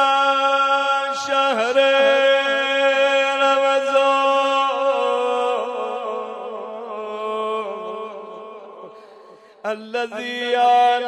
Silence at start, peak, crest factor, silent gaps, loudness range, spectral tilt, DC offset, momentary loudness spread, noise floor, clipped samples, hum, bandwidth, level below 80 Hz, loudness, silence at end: 0 s; -6 dBFS; 14 dB; none; 12 LU; -1.5 dB/octave; under 0.1%; 16 LU; -46 dBFS; under 0.1%; none; 9.2 kHz; -84 dBFS; -18 LUFS; 0 s